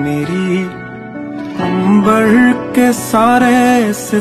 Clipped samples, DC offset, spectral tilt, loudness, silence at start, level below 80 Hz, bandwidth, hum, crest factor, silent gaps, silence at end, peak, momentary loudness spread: under 0.1%; under 0.1%; -5.5 dB/octave; -11 LUFS; 0 s; -46 dBFS; 14.5 kHz; none; 12 dB; none; 0 s; 0 dBFS; 15 LU